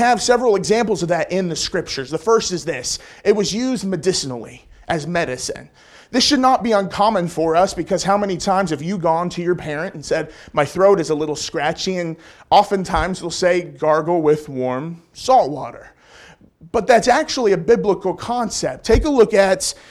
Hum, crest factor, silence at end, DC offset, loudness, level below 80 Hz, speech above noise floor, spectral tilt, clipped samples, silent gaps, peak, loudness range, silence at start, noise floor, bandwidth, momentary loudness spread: none; 16 dB; 0.15 s; under 0.1%; -18 LUFS; -38 dBFS; 28 dB; -4 dB/octave; under 0.1%; none; -2 dBFS; 3 LU; 0 s; -46 dBFS; 14 kHz; 10 LU